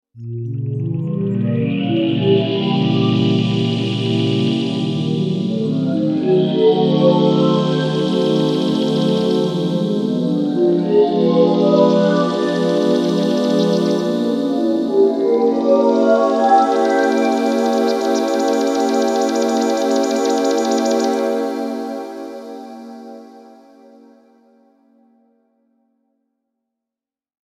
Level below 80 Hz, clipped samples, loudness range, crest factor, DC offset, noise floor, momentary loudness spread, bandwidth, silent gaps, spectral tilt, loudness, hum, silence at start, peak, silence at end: -64 dBFS; under 0.1%; 5 LU; 16 dB; under 0.1%; -88 dBFS; 8 LU; 14 kHz; none; -6.5 dB/octave; -16 LUFS; none; 0.15 s; 0 dBFS; 4.1 s